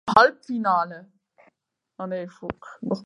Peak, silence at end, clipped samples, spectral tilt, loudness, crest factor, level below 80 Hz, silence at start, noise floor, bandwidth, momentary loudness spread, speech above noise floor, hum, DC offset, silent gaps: 0 dBFS; 0 s; under 0.1%; -5.5 dB/octave; -24 LUFS; 24 dB; -60 dBFS; 0.05 s; -69 dBFS; 11 kHz; 19 LU; 45 dB; none; under 0.1%; none